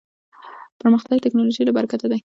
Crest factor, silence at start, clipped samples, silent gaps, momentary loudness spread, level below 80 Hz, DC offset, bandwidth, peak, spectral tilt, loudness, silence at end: 16 dB; 0.45 s; under 0.1%; 0.72-0.80 s; 5 LU; -68 dBFS; under 0.1%; 7.4 kHz; -6 dBFS; -7 dB/octave; -19 LUFS; 0.2 s